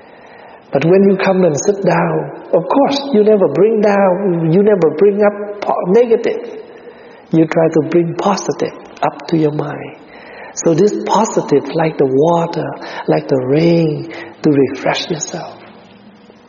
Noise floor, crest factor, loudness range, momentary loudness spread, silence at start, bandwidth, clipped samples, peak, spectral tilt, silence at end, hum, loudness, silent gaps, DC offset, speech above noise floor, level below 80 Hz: -41 dBFS; 14 dB; 4 LU; 12 LU; 0.4 s; 7.2 kHz; under 0.1%; 0 dBFS; -6 dB/octave; 0.75 s; none; -14 LUFS; none; under 0.1%; 28 dB; -58 dBFS